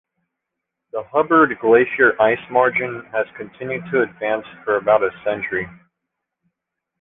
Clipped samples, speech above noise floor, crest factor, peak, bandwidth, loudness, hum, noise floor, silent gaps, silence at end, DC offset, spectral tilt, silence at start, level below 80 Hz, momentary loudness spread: under 0.1%; 63 dB; 18 dB; -2 dBFS; 3.8 kHz; -18 LUFS; none; -81 dBFS; none; 1.3 s; under 0.1%; -9 dB/octave; 0.95 s; -58 dBFS; 13 LU